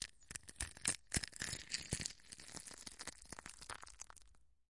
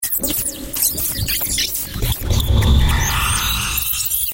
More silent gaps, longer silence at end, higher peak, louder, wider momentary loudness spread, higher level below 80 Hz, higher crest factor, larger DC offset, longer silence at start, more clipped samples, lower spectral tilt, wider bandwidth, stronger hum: neither; about the same, 0 s vs 0 s; second, -14 dBFS vs -2 dBFS; second, -45 LUFS vs -17 LUFS; first, 13 LU vs 5 LU; second, -62 dBFS vs -22 dBFS; first, 34 dB vs 16 dB; second, under 0.1% vs 0.2%; about the same, 0 s vs 0 s; neither; second, -1.5 dB/octave vs -3 dB/octave; second, 11.5 kHz vs 17.5 kHz; neither